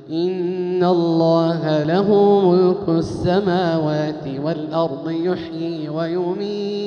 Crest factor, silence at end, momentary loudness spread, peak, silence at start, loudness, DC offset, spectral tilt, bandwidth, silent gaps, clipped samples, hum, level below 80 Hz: 14 dB; 0 s; 10 LU; -4 dBFS; 0 s; -19 LUFS; under 0.1%; -8 dB/octave; 6.8 kHz; none; under 0.1%; none; -50 dBFS